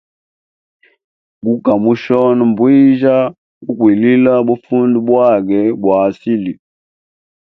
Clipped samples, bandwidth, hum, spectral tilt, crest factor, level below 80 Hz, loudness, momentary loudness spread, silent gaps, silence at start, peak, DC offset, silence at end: under 0.1%; 5.8 kHz; none; -9.5 dB/octave; 12 dB; -56 dBFS; -12 LUFS; 10 LU; 3.38-3.61 s; 1.45 s; 0 dBFS; under 0.1%; 0.85 s